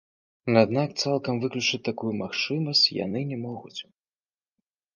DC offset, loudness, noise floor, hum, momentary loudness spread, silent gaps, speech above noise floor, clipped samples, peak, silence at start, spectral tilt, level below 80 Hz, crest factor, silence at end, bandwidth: under 0.1%; -25 LUFS; under -90 dBFS; none; 15 LU; none; over 64 dB; under 0.1%; -6 dBFS; 0.45 s; -4.5 dB/octave; -66 dBFS; 22 dB; 1.15 s; 10 kHz